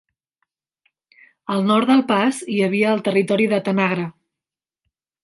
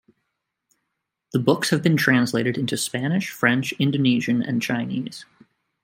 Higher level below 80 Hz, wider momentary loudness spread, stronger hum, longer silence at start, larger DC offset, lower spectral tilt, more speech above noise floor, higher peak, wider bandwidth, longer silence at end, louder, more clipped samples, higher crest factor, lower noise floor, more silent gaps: second, -70 dBFS vs -64 dBFS; about the same, 10 LU vs 9 LU; neither; first, 1.5 s vs 1.35 s; neither; about the same, -6 dB/octave vs -5 dB/octave; first, 71 dB vs 58 dB; about the same, -4 dBFS vs -2 dBFS; second, 11.5 kHz vs 16.5 kHz; first, 1.15 s vs 0.6 s; first, -19 LUFS vs -22 LUFS; neither; about the same, 18 dB vs 20 dB; first, -89 dBFS vs -79 dBFS; neither